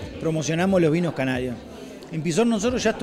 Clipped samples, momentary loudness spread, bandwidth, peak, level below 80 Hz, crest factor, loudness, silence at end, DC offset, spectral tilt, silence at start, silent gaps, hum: under 0.1%; 15 LU; 13.5 kHz; -8 dBFS; -48 dBFS; 14 dB; -23 LUFS; 0 s; under 0.1%; -5.5 dB/octave; 0 s; none; none